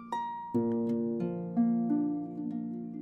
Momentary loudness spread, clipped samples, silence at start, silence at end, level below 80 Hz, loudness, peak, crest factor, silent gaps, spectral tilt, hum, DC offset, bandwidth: 8 LU; under 0.1%; 0 s; 0 s; -70 dBFS; -32 LUFS; -18 dBFS; 14 dB; none; -9.5 dB/octave; none; under 0.1%; 6 kHz